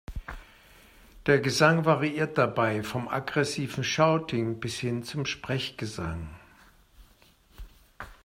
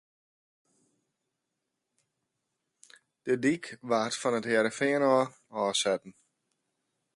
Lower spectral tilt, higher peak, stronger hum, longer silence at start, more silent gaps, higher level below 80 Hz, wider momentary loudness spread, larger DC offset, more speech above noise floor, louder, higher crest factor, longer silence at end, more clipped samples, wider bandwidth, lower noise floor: first, -5 dB/octave vs -3.5 dB/octave; first, -8 dBFS vs -12 dBFS; neither; second, 0.1 s vs 3.25 s; neither; first, -50 dBFS vs -80 dBFS; first, 19 LU vs 9 LU; neither; second, 33 dB vs 56 dB; about the same, -27 LUFS vs -29 LUFS; about the same, 22 dB vs 20 dB; second, 0.1 s vs 1.05 s; neither; first, 16 kHz vs 11.5 kHz; second, -60 dBFS vs -84 dBFS